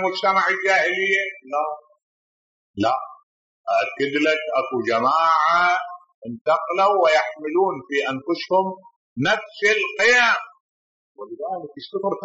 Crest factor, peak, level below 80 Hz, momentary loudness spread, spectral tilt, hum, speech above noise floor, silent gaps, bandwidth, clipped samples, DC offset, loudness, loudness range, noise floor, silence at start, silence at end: 14 dB; -6 dBFS; -70 dBFS; 16 LU; -1.5 dB/octave; none; over 69 dB; 2.03-2.74 s, 3.23-3.64 s, 6.14-6.22 s, 6.41-6.45 s, 8.96-9.16 s, 10.60-11.15 s; 8 kHz; under 0.1%; under 0.1%; -20 LUFS; 5 LU; under -90 dBFS; 0 s; 0 s